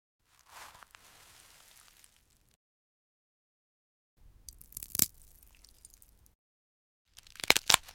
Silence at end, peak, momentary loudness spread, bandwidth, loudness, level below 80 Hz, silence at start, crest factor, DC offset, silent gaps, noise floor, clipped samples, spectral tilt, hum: 0.15 s; -2 dBFS; 29 LU; 17 kHz; -28 LUFS; -64 dBFS; 0.6 s; 36 dB; under 0.1%; 2.56-4.17 s, 6.35-7.05 s; -68 dBFS; under 0.1%; 0 dB/octave; none